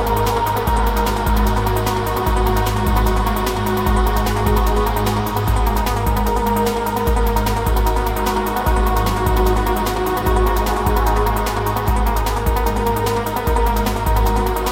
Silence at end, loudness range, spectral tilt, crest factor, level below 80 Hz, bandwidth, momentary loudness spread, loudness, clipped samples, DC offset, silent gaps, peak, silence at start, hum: 0 s; 1 LU; -5.5 dB/octave; 14 dB; -20 dBFS; 17 kHz; 2 LU; -18 LUFS; under 0.1%; under 0.1%; none; -4 dBFS; 0 s; none